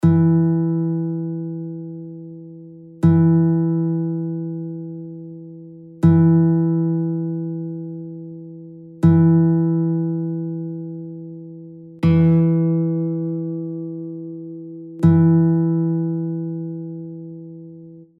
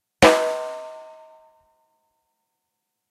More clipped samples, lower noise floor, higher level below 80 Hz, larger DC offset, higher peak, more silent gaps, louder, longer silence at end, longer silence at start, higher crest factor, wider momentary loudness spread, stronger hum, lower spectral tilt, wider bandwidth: neither; second, -41 dBFS vs -80 dBFS; about the same, -52 dBFS vs -50 dBFS; neither; about the same, -2 dBFS vs -2 dBFS; neither; about the same, -19 LUFS vs -19 LUFS; second, 0.15 s vs 2.1 s; second, 0 s vs 0.2 s; second, 16 dB vs 24 dB; about the same, 22 LU vs 24 LU; neither; first, -11.5 dB/octave vs -3.5 dB/octave; second, 3.3 kHz vs 16 kHz